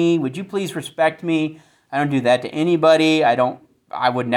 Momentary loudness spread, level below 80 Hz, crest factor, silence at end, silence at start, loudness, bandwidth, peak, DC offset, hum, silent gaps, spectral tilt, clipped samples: 11 LU; -66 dBFS; 16 dB; 0 s; 0 s; -19 LUFS; 13 kHz; -2 dBFS; under 0.1%; none; none; -6 dB/octave; under 0.1%